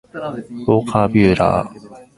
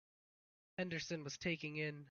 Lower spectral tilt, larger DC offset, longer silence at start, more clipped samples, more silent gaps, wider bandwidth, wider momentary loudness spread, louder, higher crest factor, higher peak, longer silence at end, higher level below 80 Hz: first, -7.5 dB/octave vs -4 dB/octave; neither; second, 0.15 s vs 0.8 s; neither; neither; first, 11.5 kHz vs 7 kHz; first, 14 LU vs 4 LU; first, -16 LUFS vs -44 LUFS; about the same, 18 dB vs 20 dB; first, 0 dBFS vs -26 dBFS; first, 0.15 s vs 0 s; first, -40 dBFS vs -74 dBFS